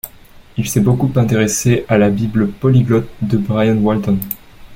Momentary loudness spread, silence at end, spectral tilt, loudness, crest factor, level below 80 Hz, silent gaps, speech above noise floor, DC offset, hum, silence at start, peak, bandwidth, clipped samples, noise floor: 9 LU; 0 s; -6.5 dB/octave; -15 LUFS; 14 dB; -40 dBFS; none; 27 dB; under 0.1%; none; 0.05 s; -2 dBFS; 17 kHz; under 0.1%; -41 dBFS